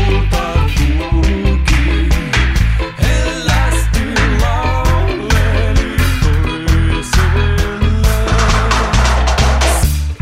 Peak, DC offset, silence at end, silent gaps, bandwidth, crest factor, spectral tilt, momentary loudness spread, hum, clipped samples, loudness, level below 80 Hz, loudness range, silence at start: 0 dBFS; 0.2%; 0.05 s; none; 16 kHz; 12 dB; -5 dB/octave; 3 LU; none; under 0.1%; -14 LUFS; -14 dBFS; 1 LU; 0 s